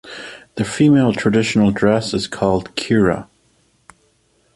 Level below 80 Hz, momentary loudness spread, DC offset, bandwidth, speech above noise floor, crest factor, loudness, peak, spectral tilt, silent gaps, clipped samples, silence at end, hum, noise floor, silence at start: -46 dBFS; 13 LU; under 0.1%; 11.5 kHz; 44 dB; 16 dB; -17 LUFS; -2 dBFS; -6 dB/octave; none; under 0.1%; 1.3 s; none; -60 dBFS; 0.05 s